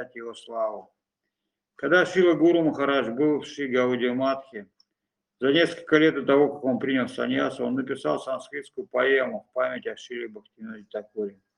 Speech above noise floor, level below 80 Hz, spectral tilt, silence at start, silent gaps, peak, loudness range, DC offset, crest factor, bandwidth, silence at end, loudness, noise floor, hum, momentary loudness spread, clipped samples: 59 dB; -72 dBFS; -5.5 dB/octave; 0 s; none; -6 dBFS; 5 LU; under 0.1%; 20 dB; 10.5 kHz; 0.25 s; -24 LUFS; -84 dBFS; none; 16 LU; under 0.1%